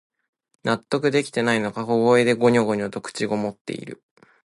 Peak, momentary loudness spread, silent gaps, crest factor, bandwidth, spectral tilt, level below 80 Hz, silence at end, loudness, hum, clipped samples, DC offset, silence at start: -6 dBFS; 14 LU; 3.61-3.65 s; 16 dB; 11.5 kHz; -5.5 dB/octave; -64 dBFS; 0.5 s; -22 LUFS; none; under 0.1%; under 0.1%; 0.65 s